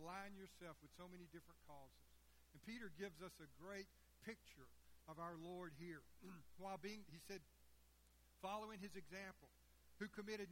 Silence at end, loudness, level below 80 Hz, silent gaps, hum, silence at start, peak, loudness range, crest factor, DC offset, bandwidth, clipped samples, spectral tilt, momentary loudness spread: 0 s; -57 LUFS; -76 dBFS; none; none; 0 s; -38 dBFS; 3 LU; 20 dB; under 0.1%; 16.5 kHz; under 0.1%; -5 dB/octave; 12 LU